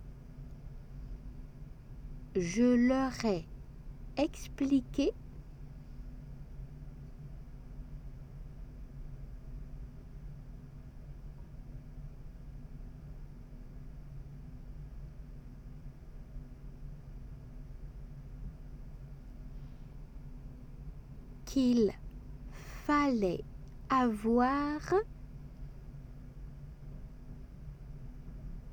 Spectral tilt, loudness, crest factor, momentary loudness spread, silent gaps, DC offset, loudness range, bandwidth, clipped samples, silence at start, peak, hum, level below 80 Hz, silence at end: -6.5 dB/octave; -32 LUFS; 20 dB; 22 LU; none; under 0.1%; 18 LU; 19 kHz; under 0.1%; 0 s; -18 dBFS; none; -48 dBFS; 0 s